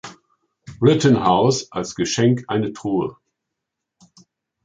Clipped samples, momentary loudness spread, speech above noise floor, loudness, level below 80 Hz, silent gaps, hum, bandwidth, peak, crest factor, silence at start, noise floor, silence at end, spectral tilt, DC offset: under 0.1%; 10 LU; 63 dB; -19 LUFS; -54 dBFS; none; none; 9.4 kHz; -2 dBFS; 18 dB; 0.05 s; -81 dBFS; 1.5 s; -5.5 dB/octave; under 0.1%